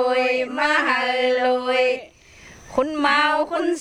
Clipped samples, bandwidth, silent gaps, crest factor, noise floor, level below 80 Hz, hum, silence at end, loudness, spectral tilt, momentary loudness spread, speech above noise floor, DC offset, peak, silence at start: under 0.1%; 11 kHz; none; 16 dB; -46 dBFS; -56 dBFS; none; 0 s; -20 LUFS; -2.5 dB/octave; 6 LU; 26 dB; under 0.1%; -4 dBFS; 0 s